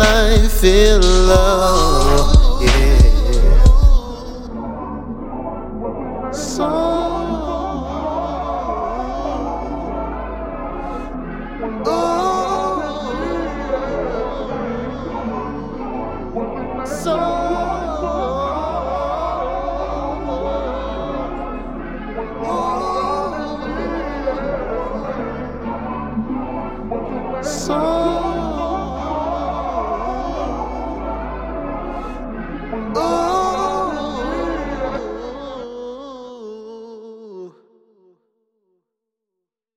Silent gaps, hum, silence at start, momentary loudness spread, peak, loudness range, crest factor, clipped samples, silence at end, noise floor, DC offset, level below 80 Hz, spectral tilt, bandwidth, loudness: none; none; 0 s; 15 LU; 0 dBFS; 10 LU; 18 dB; under 0.1%; 2.25 s; -81 dBFS; under 0.1%; -20 dBFS; -5.5 dB/octave; 16.5 kHz; -20 LUFS